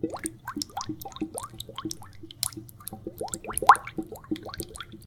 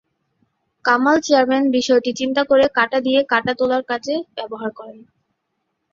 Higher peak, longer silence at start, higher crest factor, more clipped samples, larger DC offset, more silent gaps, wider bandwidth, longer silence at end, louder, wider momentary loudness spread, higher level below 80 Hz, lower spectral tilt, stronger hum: about the same, 0 dBFS vs -2 dBFS; second, 0 s vs 0.85 s; first, 30 dB vs 18 dB; neither; neither; neither; first, 19.5 kHz vs 7.6 kHz; second, 0 s vs 1 s; second, -29 LUFS vs -18 LUFS; first, 18 LU vs 13 LU; first, -54 dBFS vs -60 dBFS; about the same, -3 dB/octave vs -3.5 dB/octave; neither